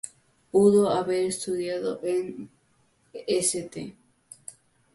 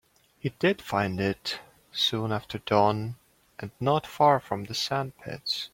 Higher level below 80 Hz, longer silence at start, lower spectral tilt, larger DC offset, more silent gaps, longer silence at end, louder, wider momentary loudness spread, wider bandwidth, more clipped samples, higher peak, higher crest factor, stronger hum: about the same, -66 dBFS vs -62 dBFS; second, 0.05 s vs 0.45 s; about the same, -4.5 dB/octave vs -5 dB/octave; neither; neither; first, 0.45 s vs 0.05 s; about the same, -25 LUFS vs -27 LUFS; first, 24 LU vs 15 LU; second, 12 kHz vs 16.5 kHz; neither; about the same, -8 dBFS vs -8 dBFS; about the same, 20 dB vs 20 dB; neither